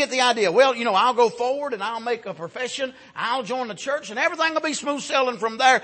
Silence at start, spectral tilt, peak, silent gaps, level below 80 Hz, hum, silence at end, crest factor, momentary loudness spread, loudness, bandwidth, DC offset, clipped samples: 0 s; -2 dB/octave; -4 dBFS; none; -74 dBFS; none; 0 s; 18 dB; 11 LU; -22 LUFS; 8.8 kHz; under 0.1%; under 0.1%